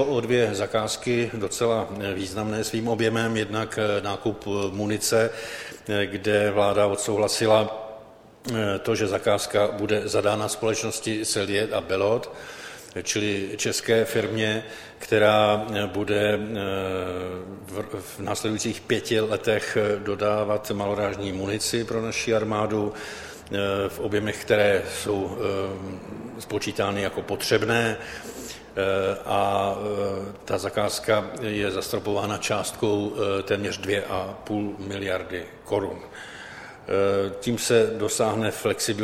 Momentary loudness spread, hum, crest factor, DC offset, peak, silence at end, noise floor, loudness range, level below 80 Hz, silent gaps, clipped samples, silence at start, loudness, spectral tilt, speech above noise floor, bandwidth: 12 LU; none; 20 dB; under 0.1%; -4 dBFS; 0 s; -47 dBFS; 4 LU; -56 dBFS; none; under 0.1%; 0 s; -25 LUFS; -4 dB/octave; 22 dB; 16.5 kHz